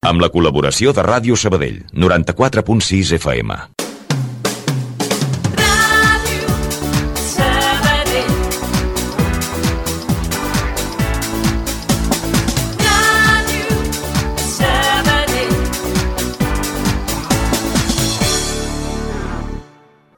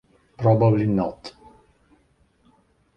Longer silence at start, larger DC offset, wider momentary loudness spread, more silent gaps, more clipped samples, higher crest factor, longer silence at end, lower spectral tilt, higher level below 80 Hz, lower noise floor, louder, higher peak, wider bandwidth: second, 0.05 s vs 0.4 s; neither; second, 9 LU vs 22 LU; neither; neither; about the same, 16 dB vs 20 dB; second, 0.5 s vs 1.65 s; second, -4 dB/octave vs -10 dB/octave; first, -26 dBFS vs -52 dBFS; second, -47 dBFS vs -62 dBFS; first, -16 LUFS vs -21 LUFS; first, 0 dBFS vs -4 dBFS; first, 19 kHz vs 6 kHz